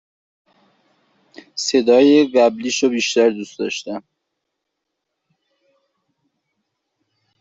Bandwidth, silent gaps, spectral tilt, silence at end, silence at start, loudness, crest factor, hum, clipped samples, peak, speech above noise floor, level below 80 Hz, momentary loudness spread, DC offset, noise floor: 7.8 kHz; none; -3.5 dB/octave; 3.4 s; 1.55 s; -16 LUFS; 18 dB; none; under 0.1%; -2 dBFS; 62 dB; -68 dBFS; 16 LU; under 0.1%; -78 dBFS